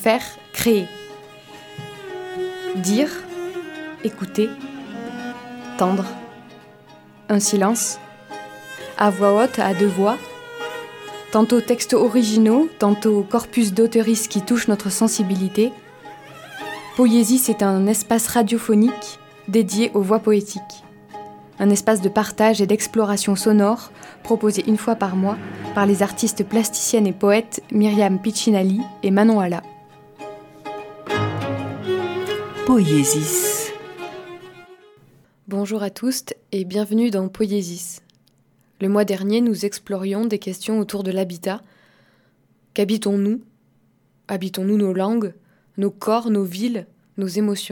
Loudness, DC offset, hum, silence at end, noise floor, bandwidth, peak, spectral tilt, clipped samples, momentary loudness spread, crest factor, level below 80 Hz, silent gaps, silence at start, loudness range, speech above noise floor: -20 LUFS; under 0.1%; none; 0 s; -60 dBFS; 19 kHz; -2 dBFS; -5 dB/octave; under 0.1%; 18 LU; 20 dB; -60 dBFS; none; 0 s; 7 LU; 42 dB